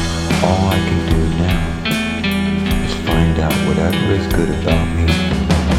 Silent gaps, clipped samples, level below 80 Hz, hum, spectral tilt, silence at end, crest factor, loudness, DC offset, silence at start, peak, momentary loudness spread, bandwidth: none; under 0.1%; -24 dBFS; none; -6 dB/octave; 0 s; 16 dB; -16 LUFS; under 0.1%; 0 s; 0 dBFS; 3 LU; 16.5 kHz